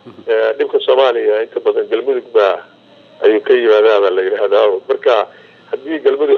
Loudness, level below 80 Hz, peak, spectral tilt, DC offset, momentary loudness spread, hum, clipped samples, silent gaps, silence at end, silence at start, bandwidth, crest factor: -14 LUFS; -76 dBFS; 0 dBFS; -4.5 dB/octave; under 0.1%; 7 LU; none; under 0.1%; none; 0 s; 0.05 s; 6.2 kHz; 12 dB